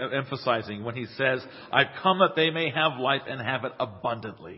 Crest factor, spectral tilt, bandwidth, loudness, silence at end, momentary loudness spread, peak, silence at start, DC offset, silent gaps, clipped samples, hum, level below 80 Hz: 24 dB; -9 dB/octave; 5.8 kHz; -26 LUFS; 0 s; 10 LU; -4 dBFS; 0 s; under 0.1%; none; under 0.1%; none; -64 dBFS